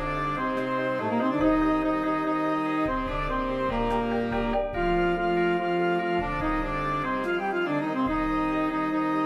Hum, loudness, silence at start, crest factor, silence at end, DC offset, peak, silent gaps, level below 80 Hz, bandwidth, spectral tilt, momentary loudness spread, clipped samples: none; -26 LUFS; 0 s; 16 dB; 0 s; under 0.1%; -10 dBFS; none; -40 dBFS; 11.5 kHz; -7.5 dB/octave; 3 LU; under 0.1%